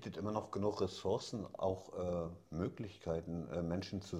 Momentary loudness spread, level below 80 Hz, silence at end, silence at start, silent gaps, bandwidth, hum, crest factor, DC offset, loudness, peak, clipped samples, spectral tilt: 5 LU; -66 dBFS; 0 s; 0 s; none; 13.5 kHz; none; 18 dB; under 0.1%; -41 LUFS; -22 dBFS; under 0.1%; -6.5 dB/octave